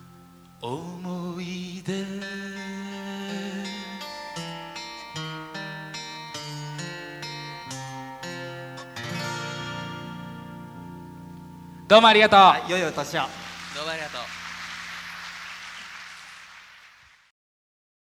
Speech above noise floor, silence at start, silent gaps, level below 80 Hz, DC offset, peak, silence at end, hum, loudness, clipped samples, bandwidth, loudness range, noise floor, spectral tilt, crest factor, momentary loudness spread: 34 dB; 0 s; none; -64 dBFS; under 0.1%; -2 dBFS; 1.3 s; none; -25 LUFS; under 0.1%; 19 kHz; 16 LU; -54 dBFS; -4 dB/octave; 26 dB; 23 LU